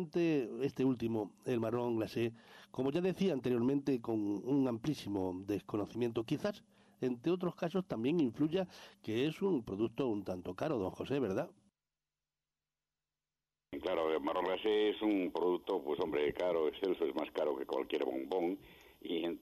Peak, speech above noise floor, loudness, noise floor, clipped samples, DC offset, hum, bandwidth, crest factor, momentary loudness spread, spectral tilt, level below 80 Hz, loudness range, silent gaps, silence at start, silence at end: -24 dBFS; over 54 dB; -36 LUFS; under -90 dBFS; under 0.1%; under 0.1%; none; 13 kHz; 12 dB; 7 LU; -7 dB/octave; -70 dBFS; 6 LU; none; 0 s; 0.05 s